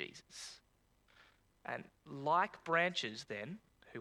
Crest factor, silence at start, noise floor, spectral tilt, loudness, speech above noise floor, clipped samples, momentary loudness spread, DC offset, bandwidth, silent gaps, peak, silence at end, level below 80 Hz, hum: 22 dB; 0 s; -74 dBFS; -3.5 dB/octave; -38 LUFS; 35 dB; under 0.1%; 19 LU; under 0.1%; 19 kHz; none; -18 dBFS; 0 s; -78 dBFS; none